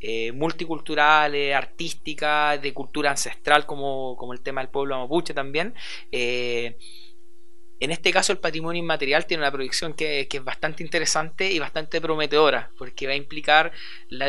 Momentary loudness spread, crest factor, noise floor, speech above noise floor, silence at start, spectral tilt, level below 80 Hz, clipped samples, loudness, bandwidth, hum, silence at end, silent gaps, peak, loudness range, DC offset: 12 LU; 24 dB; -58 dBFS; 34 dB; 0 s; -2.5 dB/octave; -58 dBFS; under 0.1%; -24 LUFS; 12 kHz; none; 0 s; none; 0 dBFS; 5 LU; 4%